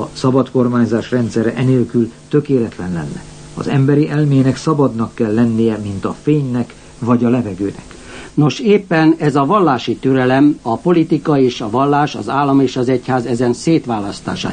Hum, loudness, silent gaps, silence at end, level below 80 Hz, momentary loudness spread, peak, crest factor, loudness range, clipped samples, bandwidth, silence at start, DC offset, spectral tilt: none; -15 LUFS; none; 0 s; -46 dBFS; 10 LU; -2 dBFS; 14 dB; 3 LU; under 0.1%; 9.6 kHz; 0 s; 0.1%; -7 dB/octave